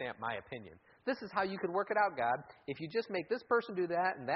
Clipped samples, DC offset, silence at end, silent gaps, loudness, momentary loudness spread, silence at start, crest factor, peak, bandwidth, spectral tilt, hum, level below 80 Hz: under 0.1%; under 0.1%; 0 s; none; -36 LUFS; 11 LU; 0 s; 18 dB; -18 dBFS; 5.8 kHz; -3.5 dB/octave; none; -74 dBFS